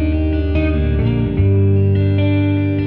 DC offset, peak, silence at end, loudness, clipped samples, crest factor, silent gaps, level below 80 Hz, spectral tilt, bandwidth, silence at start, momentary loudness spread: under 0.1%; -6 dBFS; 0 s; -16 LUFS; under 0.1%; 10 dB; none; -22 dBFS; -11 dB/octave; 4.4 kHz; 0 s; 3 LU